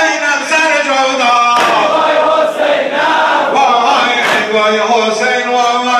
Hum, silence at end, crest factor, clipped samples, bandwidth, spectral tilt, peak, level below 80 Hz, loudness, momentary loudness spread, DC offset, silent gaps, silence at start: none; 0 s; 10 dB; under 0.1%; 15 kHz; -1.5 dB/octave; 0 dBFS; -60 dBFS; -10 LUFS; 3 LU; under 0.1%; none; 0 s